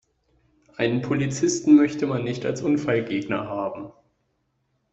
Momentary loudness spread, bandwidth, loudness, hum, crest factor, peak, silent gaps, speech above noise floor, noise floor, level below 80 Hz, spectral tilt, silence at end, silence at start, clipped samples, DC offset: 14 LU; 8.2 kHz; -23 LUFS; none; 18 dB; -6 dBFS; none; 50 dB; -72 dBFS; -60 dBFS; -5.5 dB/octave; 1 s; 0.8 s; under 0.1%; under 0.1%